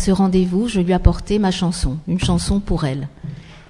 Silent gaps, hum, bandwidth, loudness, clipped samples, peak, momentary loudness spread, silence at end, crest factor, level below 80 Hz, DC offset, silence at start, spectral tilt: none; none; 11.5 kHz; -19 LUFS; under 0.1%; 0 dBFS; 11 LU; 0.1 s; 18 dB; -26 dBFS; under 0.1%; 0 s; -6.5 dB/octave